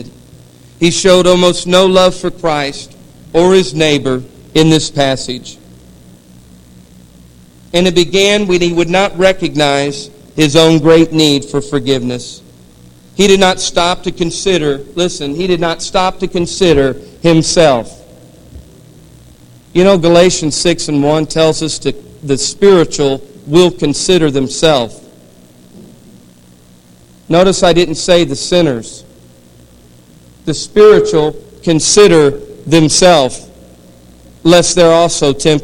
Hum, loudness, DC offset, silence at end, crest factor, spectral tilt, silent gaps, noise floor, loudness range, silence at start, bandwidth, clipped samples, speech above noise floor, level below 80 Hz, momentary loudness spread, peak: none; -11 LUFS; under 0.1%; 0 s; 12 dB; -4.5 dB/octave; none; -42 dBFS; 5 LU; 0 s; 17 kHz; 0.7%; 32 dB; -34 dBFS; 11 LU; 0 dBFS